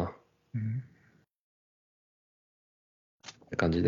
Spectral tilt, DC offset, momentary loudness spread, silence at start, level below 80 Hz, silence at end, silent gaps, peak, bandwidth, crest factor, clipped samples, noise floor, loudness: -7 dB/octave; under 0.1%; 22 LU; 0 s; -56 dBFS; 0 s; 1.35-3.20 s; -10 dBFS; 7.6 kHz; 26 dB; under 0.1%; -66 dBFS; -35 LUFS